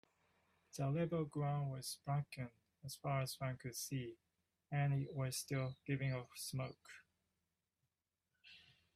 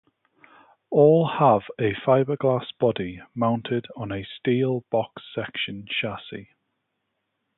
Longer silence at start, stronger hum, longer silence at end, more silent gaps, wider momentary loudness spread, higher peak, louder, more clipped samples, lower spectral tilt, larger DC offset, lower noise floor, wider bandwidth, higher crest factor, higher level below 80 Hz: second, 0.75 s vs 0.9 s; neither; second, 0.35 s vs 1.15 s; neither; first, 18 LU vs 14 LU; second, -26 dBFS vs -4 dBFS; second, -43 LUFS vs -24 LUFS; neither; second, -5.5 dB/octave vs -11 dB/octave; neither; first, under -90 dBFS vs -78 dBFS; first, 15.5 kHz vs 4.1 kHz; about the same, 18 dB vs 20 dB; second, -76 dBFS vs -60 dBFS